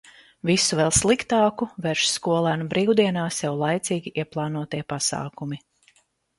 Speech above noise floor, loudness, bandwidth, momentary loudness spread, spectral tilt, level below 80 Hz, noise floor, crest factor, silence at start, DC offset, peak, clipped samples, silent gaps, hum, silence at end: 39 dB; -23 LUFS; 11.5 kHz; 11 LU; -4 dB/octave; -50 dBFS; -62 dBFS; 20 dB; 0.45 s; under 0.1%; -4 dBFS; under 0.1%; none; none; 0.8 s